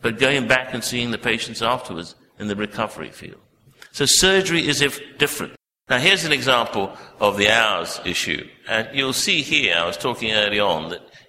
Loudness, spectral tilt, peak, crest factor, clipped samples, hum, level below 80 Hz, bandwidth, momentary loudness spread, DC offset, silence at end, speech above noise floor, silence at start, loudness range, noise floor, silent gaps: -19 LUFS; -2.5 dB/octave; 0 dBFS; 20 dB; under 0.1%; none; -50 dBFS; 16 kHz; 14 LU; under 0.1%; 0.1 s; 27 dB; 0 s; 5 LU; -47 dBFS; none